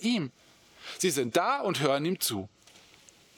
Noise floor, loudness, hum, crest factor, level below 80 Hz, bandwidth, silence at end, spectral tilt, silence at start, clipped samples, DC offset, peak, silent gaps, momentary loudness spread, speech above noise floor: -58 dBFS; -29 LUFS; none; 22 dB; -78 dBFS; over 20 kHz; 0.9 s; -4 dB/octave; 0 s; under 0.1%; under 0.1%; -10 dBFS; none; 16 LU; 29 dB